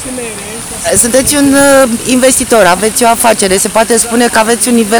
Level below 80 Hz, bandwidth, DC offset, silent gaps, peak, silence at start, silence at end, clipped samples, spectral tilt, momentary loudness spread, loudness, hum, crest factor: -34 dBFS; over 20 kHz; under 0.1%; none; 0 dBFS; 0 s; 0 s; 2%; -2.5 dB/octave; 11 LU; -7 LUFS; none; 8 dB